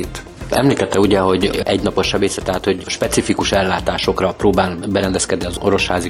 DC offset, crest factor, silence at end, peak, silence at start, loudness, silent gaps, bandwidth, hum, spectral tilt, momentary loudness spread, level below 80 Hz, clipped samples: under 0.1%; 16 dB; 0 s; -2 dBFS; 0 s; -17 LUFS; none; 15.5 kHz; none; -4.5 dB/octave; 5 LU; -34 dBFS; under 0.1%